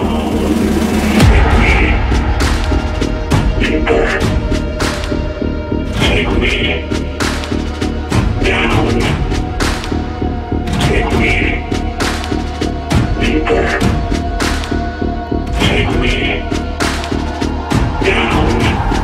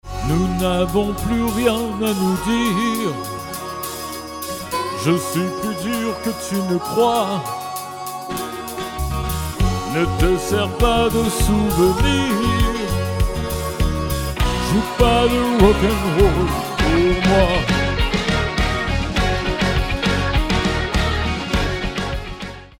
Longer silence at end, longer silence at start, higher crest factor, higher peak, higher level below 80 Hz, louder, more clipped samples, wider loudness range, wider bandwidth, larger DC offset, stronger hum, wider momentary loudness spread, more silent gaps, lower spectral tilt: about the same, 0 s vs 0.1 s; about the same, 0 s vs 0.05 s; about the same, 14 dB vs 18 dB; about the same, 0 dBFS vs 0 dBFS; first, -18 dBFS vs -26 dBFS; first, -15 LUFS vs -19 LUFS; neither; second, 3 LU vs 6 LU; second, 15.5 kHz vs 18 kHz; neither; neither; second, 7 LU vs 11 LU; neither; about the same, -5.5 dB/octave vs -5 dB/octave